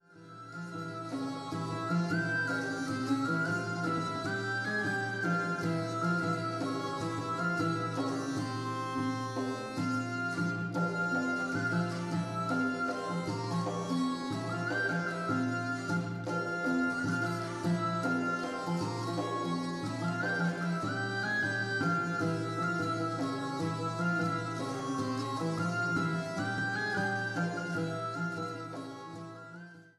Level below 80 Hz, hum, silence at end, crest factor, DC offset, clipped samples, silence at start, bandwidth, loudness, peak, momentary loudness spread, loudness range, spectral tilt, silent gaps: -70 dBFS; none; 0.1 s; 14 dB; under 0.1%; under 0.1%; 0.1 s; 12.5 kHz; -33 LUFS; -18 dBFS; 5 LU; 2 LU; -6 dB/octave; none